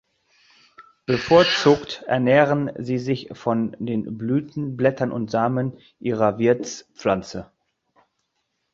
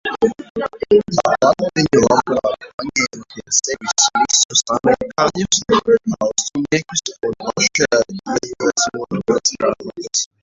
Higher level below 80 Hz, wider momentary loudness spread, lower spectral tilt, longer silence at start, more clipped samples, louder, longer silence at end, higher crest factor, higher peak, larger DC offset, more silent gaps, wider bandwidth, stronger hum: second, -56 dBFS vs -50 dBFS; first, 12 LU vs 9 LU; first, -6 dB/octave vs -2.5 dB/octave; first, 0.8 s vs 0.05 s; neither; second, -21 LUFS vs -17 LUFS; first, 1.3 s vs 0.15 s; about the same, 20 dB vs 16 dB; about the same, -2 dBFS vs 0 dBFS; neither; second, none vs 0.50-0.55 s, 2.74-2.78 s, 4.45-4.49 s; about the same, 7.6 kHz vs 8 kHz; neither